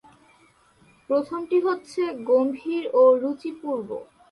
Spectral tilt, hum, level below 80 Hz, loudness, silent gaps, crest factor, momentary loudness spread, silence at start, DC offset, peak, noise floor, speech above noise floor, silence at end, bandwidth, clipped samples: -6 dB/octave; none; -70 dBFS; -23 LUFS; none; 16 dB; 12 LU; 1.1 s; under 0.1%; -8 dBFS; -58 dBFS; 36 dB; 0.3 s; 11.5 kHz; under 0.1%